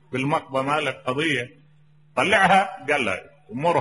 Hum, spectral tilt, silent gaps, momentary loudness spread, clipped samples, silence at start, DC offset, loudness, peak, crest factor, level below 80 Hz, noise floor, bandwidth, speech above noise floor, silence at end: none; -4.5 dB/octave; none; 13 LU; under 0.1%; 0.1 s; 0.1%; -22 LUFS; -4 dBFS; 18 dB; -60 dBFS; -56 dBFS; 11.5 kHz; 34 dB; 0 s